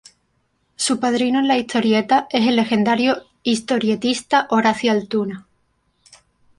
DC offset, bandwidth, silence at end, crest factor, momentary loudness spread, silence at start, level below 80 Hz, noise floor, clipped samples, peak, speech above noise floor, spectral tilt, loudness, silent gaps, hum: under 0.1%; 11.5 kHz; 1.15 s; 18 dB; 7 LU; 0.8 s; -62 dBFS; -66 dBFS; under 0.1%; -2 dBFS; 49 dB; -4 dB/octave; -18 LUFS; none; none